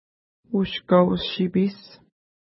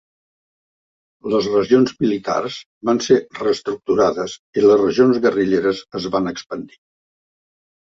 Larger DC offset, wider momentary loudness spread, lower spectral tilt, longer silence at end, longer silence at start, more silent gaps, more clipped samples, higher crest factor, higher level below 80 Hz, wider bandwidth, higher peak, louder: neither; second, 8 LU vs 12 LU; first, -11 dB/octave vs -5.5 dB/octave; second, 0.65 s vs 1.15 s; second, 0.5 s vs 1.25 s; second, none vs 2.66-2.81 s, 4.39-4.53 s; neither; about the same, 18 dB vs 18 dB; about the same, -54 dBFS vs -56 dBFS; second, 5.8 kHz vs 7.8 kHz; second, -6 dBFS vs -2 dBFS; second, -22 LUFS vs -18 LUFS